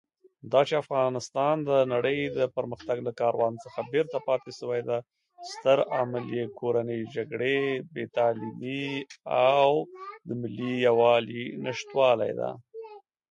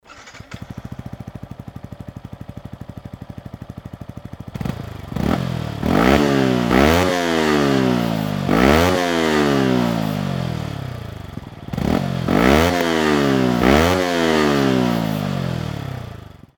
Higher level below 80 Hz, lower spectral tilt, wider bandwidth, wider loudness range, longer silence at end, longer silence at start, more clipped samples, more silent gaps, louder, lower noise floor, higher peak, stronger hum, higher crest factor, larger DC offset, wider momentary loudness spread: second, -70 dBFS vs -34 dBFS; about the same, -5.5 dB/octave vs -6 dB/octave; second, 10.5 kHz vs over 20 kHz; second, 4 LU vs 19 LU; about the same, 0.3 s vs 0.3 s; first, 0.45 s vs 0.1 s; neither; neither; second, -27 LUFS vs -18 LUFS; first, -46 dBFS vs -40 dBFS; second, -8 dBFS vs 0 dBFS; neither; about the same, 18 dB vs 20 dB; neither; second, 12 LU vs 21 LU